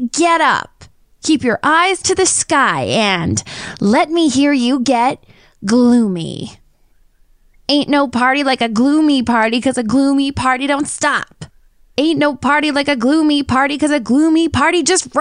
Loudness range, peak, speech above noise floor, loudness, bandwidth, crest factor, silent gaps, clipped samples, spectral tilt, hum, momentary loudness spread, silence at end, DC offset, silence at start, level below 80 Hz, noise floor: 3 LU; 0 dBFS; 38 dB; -14 LUFS; 10.5 kHz; 14 dB; none; under 0.1%; -3.5 dB/octave; none; 8 LU; 0 s; under 0.1%; 0 s; -46 dBFS; -52 dBFS